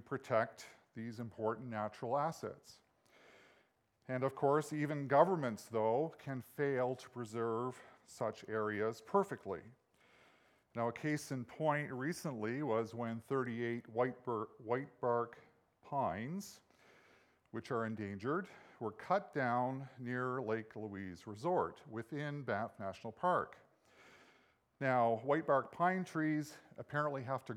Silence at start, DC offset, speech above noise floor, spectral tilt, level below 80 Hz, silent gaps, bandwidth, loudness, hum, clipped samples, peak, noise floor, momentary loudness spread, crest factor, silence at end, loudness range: 0.1 s; under 0.1%; 37 dB; -6.5 dB/octave; -80 dBFS; none; 16.5 kHz; -39 LUFS; none; under 0.1%; -16 dBFS; -75 dBFS; 13 LU; 24 dB; 0 s; 6 LU